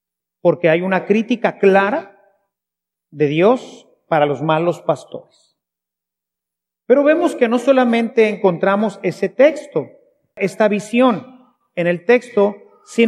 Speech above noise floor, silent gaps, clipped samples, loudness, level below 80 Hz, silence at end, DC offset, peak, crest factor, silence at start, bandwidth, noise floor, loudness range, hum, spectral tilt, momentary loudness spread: 69 dB; none; under 0.1%; -16 LUFS; -76 dBFS; 0 s; under 0.1%; 0 dBFS; 16 dB; 0.45 s; 12 kHz; -84 dBFS; 4 LU; none; -6.5 dB/octave; 10 LU